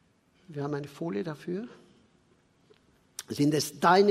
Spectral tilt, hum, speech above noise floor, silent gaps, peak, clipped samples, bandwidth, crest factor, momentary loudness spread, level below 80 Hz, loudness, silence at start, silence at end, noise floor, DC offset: -5 dB/octave; none; 38 dB; none; -8 dBFS; under 0.1%; 16 kHz; 22 dB; 20 LU; -72 dBFS; -29 LUFS; 0.5 s; 0 s; -66 dBFS; under 0.1%